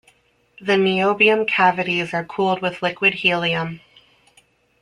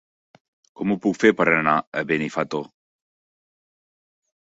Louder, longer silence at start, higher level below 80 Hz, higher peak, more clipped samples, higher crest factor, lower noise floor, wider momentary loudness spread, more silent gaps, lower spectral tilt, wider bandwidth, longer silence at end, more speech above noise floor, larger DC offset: first, -18 LUFS vs -21 LUFS; second, 0.6 s vs 0.8 s; about the same, -62 dBFS vs -64 dBFS; about the same, -2 dBFS vs -2 dBFS; neither; about the same, 18 dB vs 22 dB; second, -58 dBFS vs under -90 dBFS; about the same, 10 LU vs 11 LU; second, none vs 1.87-1.92 s; about the same, -5.5 dB/octave vs -6 dB/octave; first, 11 kHz vs 8 kHz; second, 1.05 s vs 1.75 s; second, 39 dB vs over 69 dB; neither